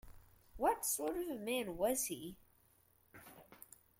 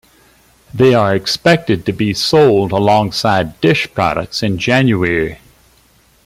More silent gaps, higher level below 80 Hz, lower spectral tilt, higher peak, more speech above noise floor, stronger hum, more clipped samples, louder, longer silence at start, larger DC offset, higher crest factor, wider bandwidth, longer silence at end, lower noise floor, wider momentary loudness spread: neither; second, -64 dBFS vs -44 dBFS; second, -2.5 dB/octave vs -5.5 dB/octave; second, -22 dBFS vs 0 dBFS; second, 32 dB vs 38 dB; neither; neither; second, -38 LUFS vs -13 LUFS; second, 0.05 s vs 0.75 s; neither; first, 20 dB vs 14 dB; about the same, 16.5 kHz vs 16 kHz; second, 0.4 s vs 0.9 s; first, -72 dBFS vs -51 dBFS; first, 22 LU vs 7 LU